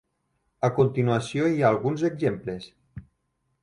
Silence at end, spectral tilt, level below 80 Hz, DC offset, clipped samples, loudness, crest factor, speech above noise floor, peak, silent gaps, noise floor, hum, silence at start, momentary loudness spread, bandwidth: 0.6 s; -7.5 dB/octave; -58 dBFS; under 0.1%; under 0.1%; -24 LUFS; 18 dB; 51 dB; -8 dBFS; none; -74 dBFS; none; 0.6 s; 13 LU; 11 kHz